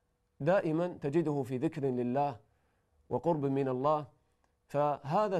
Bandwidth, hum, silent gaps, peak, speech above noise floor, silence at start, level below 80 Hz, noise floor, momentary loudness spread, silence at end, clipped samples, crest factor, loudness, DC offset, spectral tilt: 13 kHz; none; none; -16 dBFS; 43 dB; 0.4 s; -70 dBFS; -74 dBFS; 6 LU; 0 s; under 0.1%; 16 dB; -33 LUFS; under 0.1%; -8.5 dB/octave